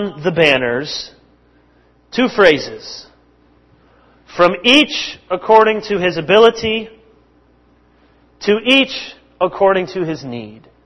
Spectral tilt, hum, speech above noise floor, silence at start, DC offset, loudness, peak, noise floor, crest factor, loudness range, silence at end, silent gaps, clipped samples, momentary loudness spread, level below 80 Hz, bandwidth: -4.5 dB/octave; 60 Hz at -55 dBFS; 38 dB; 0 s; under 0.1%; -14 LUFS; 0 dBFS; -53 dBFS; 16 dB; 6 LU; 0.3 s; none; 0.1%; 20 LU; -50 dBFS; 11 kHz